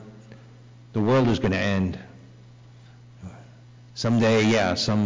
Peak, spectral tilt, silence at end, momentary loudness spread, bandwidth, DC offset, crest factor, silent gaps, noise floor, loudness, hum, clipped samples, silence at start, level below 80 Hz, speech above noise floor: -14 dBFS; -6 dB/octave; 0 s; 24 LU; 7.6 kHz; under 0.1%; 10 dB; none; -48 dBFS; -22 LUFS; 60 Hz at -50 dBFS; under 0.1%; 0 s; -46 dBFS; 27 dB